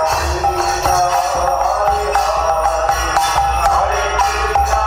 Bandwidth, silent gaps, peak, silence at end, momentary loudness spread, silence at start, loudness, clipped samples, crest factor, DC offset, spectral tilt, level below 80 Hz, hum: over 20 kHz; none; 0 dBFS; 0 s; 2 LU; 0 s; -15 LUFS; under 0.1%; 14 dB; under 0.1%; -3 dB/octave; -26 dBFS; none